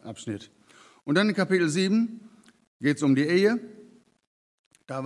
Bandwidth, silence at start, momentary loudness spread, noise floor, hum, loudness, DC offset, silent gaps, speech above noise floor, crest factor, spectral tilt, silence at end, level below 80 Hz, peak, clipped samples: 12 kHz; 0.05 s; 16 LU; -54 dBFS; none; -25 LUFS; under 0.1%; 2.67-2.80 s, 4.27-4.71 s; 30 dB; 20 dB; -5.5 dB/octave; 0 s; -80 dBFS; -8 dBFS; under 0.1%